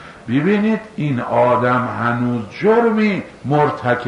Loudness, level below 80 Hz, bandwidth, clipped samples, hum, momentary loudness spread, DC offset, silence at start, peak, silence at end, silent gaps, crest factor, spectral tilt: -17 LUFS; -54 dBFS; 10 kHz; under 0.1%; none; 7 LU; under 0.1%; 0 s; -4 dBFS; 0 s; none; 12 dB; -8 dB/octave